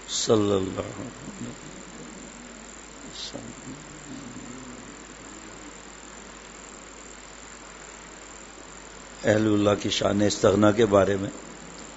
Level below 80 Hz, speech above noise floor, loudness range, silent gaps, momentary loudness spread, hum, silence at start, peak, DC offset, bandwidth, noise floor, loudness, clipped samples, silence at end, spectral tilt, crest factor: -54 dBFS; 20 dB; 19 LU; none; 21 LU; none; 0 s; -4 dBFS; under 0.1%; 8 kHz; -44 dBFS; -24 LUFS; under 0.1%; 0 s; -4.5 dB/octave; 24 dB